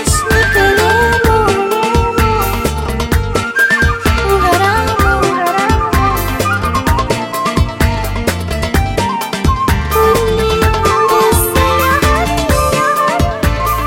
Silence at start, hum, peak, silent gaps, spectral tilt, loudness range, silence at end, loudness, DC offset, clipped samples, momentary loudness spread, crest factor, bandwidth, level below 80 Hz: 0 s; none; 0 dBFS; none; -4.5 dB/octave; 3 LU; 0 s; -12 LUFS; under 0.1%; under 0.1%; 5 LU; 12 dB; 17 kHz; -20 dBFS